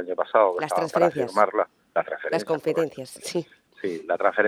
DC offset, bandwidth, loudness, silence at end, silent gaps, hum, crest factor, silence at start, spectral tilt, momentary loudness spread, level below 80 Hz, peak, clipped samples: under 0.1%; 15 kHz; -25 LUFS; 0 s; none; none; 22 dB; 0 s; -5 dB/octave; 11 LU; -74 dBFS; -2 dBFS; under 0.1%